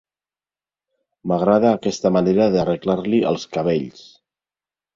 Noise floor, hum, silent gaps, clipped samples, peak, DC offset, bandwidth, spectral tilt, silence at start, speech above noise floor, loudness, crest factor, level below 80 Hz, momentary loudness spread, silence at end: under -90 dBFS; none; none; under 0.1%; -2 dBFS; under 0.1%; 7.6 kHz; -7 dB/octave; 1.25 s; over 72 dB; -19 LUFS; 18 dB; -54 dBFS; 8 LU; 0.95 s